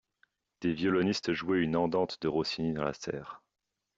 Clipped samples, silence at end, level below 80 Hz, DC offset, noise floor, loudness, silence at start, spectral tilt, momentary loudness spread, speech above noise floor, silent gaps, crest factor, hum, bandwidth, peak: under 0.1%; 0.6 s; -64 dBFS; under 0.1%; -86 dBFS; -31 LUFS; 0.6 s; -6 dB/octave; 10 LU; 55 dB; none; 16 dB; none; 7.8 kHz; -16 dBFS